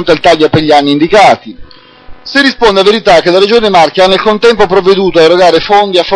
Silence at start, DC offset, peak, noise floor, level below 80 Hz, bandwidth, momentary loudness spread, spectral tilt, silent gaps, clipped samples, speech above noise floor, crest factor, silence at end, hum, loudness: 0 s; 0.5%; 0 dBFS; -29 dBFS; -34 dBFS; 11 kHz; 3 LU; -4.5 dB/octave; none; 4%; 23 dB; 6 dB; 0 s; none; -6 LUFS